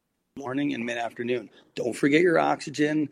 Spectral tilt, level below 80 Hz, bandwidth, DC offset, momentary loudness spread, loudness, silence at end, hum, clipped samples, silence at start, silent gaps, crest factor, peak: -5.5 dB/octave; -72 dBFS; 12.5 kHz; under 0.1%; 12 LU; -26 LUFS; 0.05 s; none; under 0.1%; 0.35 s; none; 18 dB; -8 dBFS